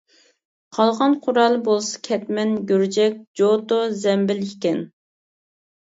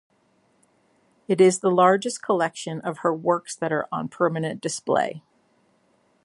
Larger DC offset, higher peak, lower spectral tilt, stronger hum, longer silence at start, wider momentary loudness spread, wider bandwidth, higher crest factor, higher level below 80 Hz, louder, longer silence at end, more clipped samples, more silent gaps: neither; about the same, -4 dBFS vs -4 dBFS; about the same, -5 dB/octave vs -5 dB/octave; neither; second, 0.75 s vs 1.3 s; second, 7 LU vs 12 LU; second, 8 kHz vs 11.5 kHz; about the same, 18 dB vs 20 dB; about the same, -72 dBFS vs -74 dBFS; first, -20 LUFS vs -23 LUFS; about the same, 1 s vs 1.05 s; neither; first, 3.27-3.34 s vs none